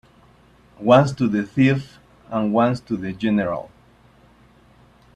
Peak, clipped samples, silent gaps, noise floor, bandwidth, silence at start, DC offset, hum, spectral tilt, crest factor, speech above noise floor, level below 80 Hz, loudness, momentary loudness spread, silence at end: -2 dBFS; under 0.1%; none; -53 dBFS; 10 kHz; 0.8 s; under 0.1%; none; -7.5 dB/octave; 20 dB; 34 dB; -54 dBFS; -20 LUFS; 12 LU; 1.5 s